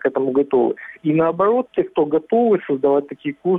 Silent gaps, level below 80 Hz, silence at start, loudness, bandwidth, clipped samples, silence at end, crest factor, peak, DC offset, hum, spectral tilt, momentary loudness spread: none; -60 dBFS; 0 s; -19 LUFS; 3.9 kHz; under 0.1%; 0 s; 12 dB; -6 dBFS; under 0.1%; none; -10 dB/octave; 6 LU